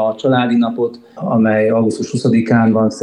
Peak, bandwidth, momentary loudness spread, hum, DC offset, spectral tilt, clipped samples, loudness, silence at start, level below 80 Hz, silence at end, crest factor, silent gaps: -2 dBFS; 10.5 kHz; 7 LU; none; under 0.1%; -7 dB/octave; under 0.1%; -15 LUFS; 0 s; -58 dBFS; 0 s; 14 dB; none